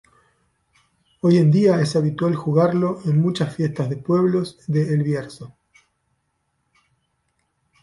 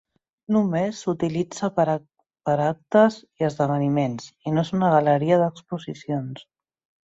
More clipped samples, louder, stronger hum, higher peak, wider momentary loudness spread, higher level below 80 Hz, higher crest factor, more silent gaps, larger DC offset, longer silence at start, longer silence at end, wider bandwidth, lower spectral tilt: neither; first, -20 LUFS vs -23 LUFS; neither; about the same, -6 dBFS vs -4 dBFS; second, 9 LU vs 13 LU; about the same, -60 dBFS vs -62 dBFS; about the same, 16 dB vs 18 dB; neither; neither; first, 1.25 s vs 0.5 s; first, 2.35 s vs 0.6 s; first, 11.5 kHz vs 8 kHz; about the same, -8 dB/octave vs -7 dB/octave